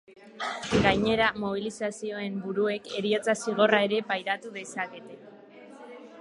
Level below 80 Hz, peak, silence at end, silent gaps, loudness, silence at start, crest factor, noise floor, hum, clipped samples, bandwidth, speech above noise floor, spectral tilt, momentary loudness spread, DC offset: -54 dBFS; -6 dBFS; 0 s; none; -27 LUFS; 0.1 s; 22 dB; -49 dBFS; none; under 0.1%; 11.5 kHz; 22 dB; -4.5 dB/octave; 20 LU; under 0.1%